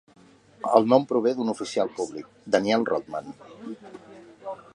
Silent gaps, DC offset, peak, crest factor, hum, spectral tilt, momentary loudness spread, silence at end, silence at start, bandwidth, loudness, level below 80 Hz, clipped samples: none; under 0.1%; -2 dBFS; 24 dB; none; -5.5 dB/octave; 21 LU; 0.2 s; 0.65 s; 11 kHz; -24 LUFS; -70 dBFS; under 0.1%